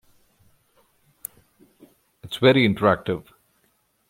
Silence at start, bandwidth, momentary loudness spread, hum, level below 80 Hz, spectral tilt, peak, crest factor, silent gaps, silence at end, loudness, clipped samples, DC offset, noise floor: 2.25 s; 16.5 kHz; 21 LU; none; -60 dBFS; -6 dB/octave; -2 dBFS; 22 dB; none; 0.9 s; -20 LUFS; under 0.1%; under 0.1%; -67 dBFS